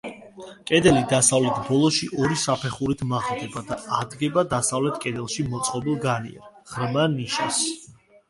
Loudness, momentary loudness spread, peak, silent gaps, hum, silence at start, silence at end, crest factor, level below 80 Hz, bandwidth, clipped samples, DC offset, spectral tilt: -23 LUFS; 13 LU; -4 dBFS; none; none; 0.05 s; 0.4 s; 20 dB; -52 dBFS; 11.5 kHz; under 0.1%; under 0.1%; -4 dB/octave